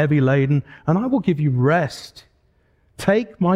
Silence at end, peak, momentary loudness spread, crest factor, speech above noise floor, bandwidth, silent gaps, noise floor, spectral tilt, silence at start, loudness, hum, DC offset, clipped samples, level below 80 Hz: 0 s; -4 dBFS; 9 LU; 16 dB; 42 dB; 12 kHz; none; -60 dBFS; -8 dB/octave; 0 s; -19 LUFS; none; under 0.1%; under 0.1%; -54 dBFS